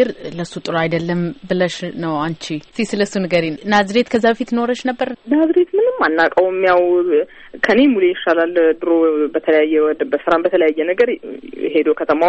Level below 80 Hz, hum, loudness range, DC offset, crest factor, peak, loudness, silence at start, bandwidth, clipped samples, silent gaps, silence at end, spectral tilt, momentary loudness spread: -54 dBFS; none; 4 LU; under 0.1%; 14 dB; -2 dBFS; -16 LUFS; 0 s; 8.8 kHz; under 0.1%; none; 0 s; -6 dB/octave; 9 LU